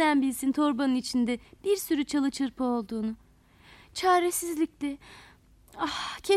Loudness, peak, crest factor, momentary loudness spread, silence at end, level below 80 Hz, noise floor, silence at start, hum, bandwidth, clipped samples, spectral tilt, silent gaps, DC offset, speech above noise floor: -28 LUFS; -12 dBFS; 16 dB; 11 LU; 0 s; -60 dBFS; -57 dBFS; 0 s; none; 15.5 kHz; under 0.1%; -3 dB/octave; none; under 0.1%; 29 dB